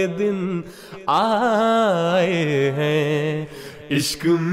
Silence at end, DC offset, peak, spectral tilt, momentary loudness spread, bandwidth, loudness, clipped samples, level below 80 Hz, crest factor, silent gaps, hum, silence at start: 0 s; under 0.1%; -8 dBFS; -5.5 dB/octave; 12 LU; 16 kHz; -20 LUFS; under 0.1%; -56 dBFS; 12 dB; none; none; 0 s